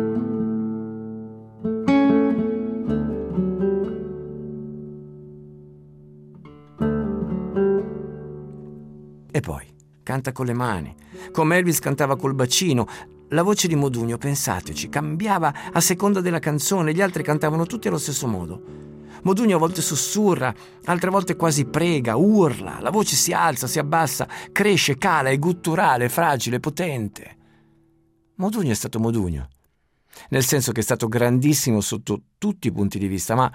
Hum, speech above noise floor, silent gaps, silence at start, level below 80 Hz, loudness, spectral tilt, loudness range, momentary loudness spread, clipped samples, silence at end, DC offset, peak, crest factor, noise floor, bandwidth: none; 44 dB; none; 0 s; -50 dBFS; -22 LUFS; -4.5 dB/octave; 8 LU; 16 LU; under 0.1%; 0 s; under 0.1%; -6 dBFS; 16 dB; -65 dBFS; 16.5 kHz